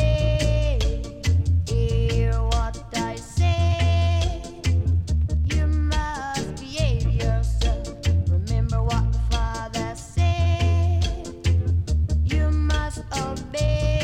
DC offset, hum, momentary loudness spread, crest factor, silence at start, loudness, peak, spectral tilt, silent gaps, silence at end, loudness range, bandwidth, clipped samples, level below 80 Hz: under 0.1%; none; 7 LU; 12 dB; 0 s; -23 LUFS; -8 dBFS; -6 dB/octave; none; 0 s; 1 LU; 10.5 kHz; under 0.1%; -26 dBFS